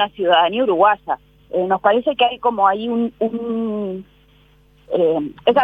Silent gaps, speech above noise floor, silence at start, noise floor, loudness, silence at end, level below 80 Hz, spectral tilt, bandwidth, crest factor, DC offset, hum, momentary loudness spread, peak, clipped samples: none; 35 dB; 0 s; -52 dBFS; -18 LUFS; 0 s; -56 dBFS; -7.5 dB/octave; 5 kHz; 18 dB; under 0.1%; 50 Hz at -55 dBFS; 11 LU; 0 dBFS; under 0.1%